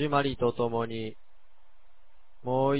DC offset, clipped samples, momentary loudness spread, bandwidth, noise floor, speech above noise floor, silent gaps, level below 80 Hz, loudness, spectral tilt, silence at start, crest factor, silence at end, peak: 0.9%; under 0.1%; 13 LU; 4 kHz; -64 dBFS; 36 dB; none; -58 dBFS; -30 LUFS; -5.5 dB/octave; 0 s; 18 dB; 0 s; -12 dBFS